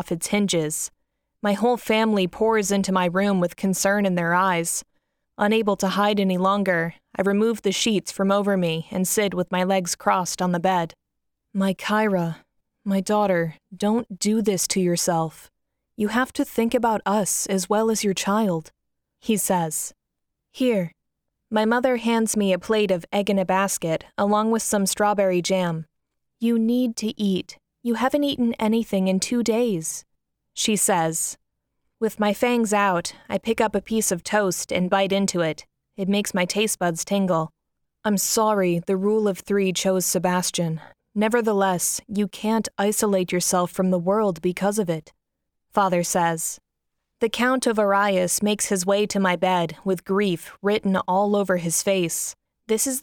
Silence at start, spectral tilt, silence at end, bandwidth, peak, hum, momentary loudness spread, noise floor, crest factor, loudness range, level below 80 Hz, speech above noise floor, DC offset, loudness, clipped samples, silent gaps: 0 s; -4 dB/octave; 0 s; 18.5 kHz; -6 dBFS; none; 7 LU; -79 dBFS; 16 dB; 2 LU; -60 dBFS; 58 dB; under 0.1%; -22 LUFS; under 0.1%; none